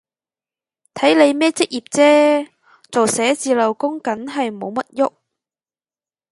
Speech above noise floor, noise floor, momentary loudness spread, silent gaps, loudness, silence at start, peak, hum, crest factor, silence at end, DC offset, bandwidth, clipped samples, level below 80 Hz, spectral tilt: over 74 dB; under -90 dBFS; 11 LU; none; -17 LUFS; 0.95 s; 0 dBFS; none; 18 dB; 1.25 s; under 0.1%; 11.5 kHz; under 0.1%; -68 dBFS; -3 dB/octave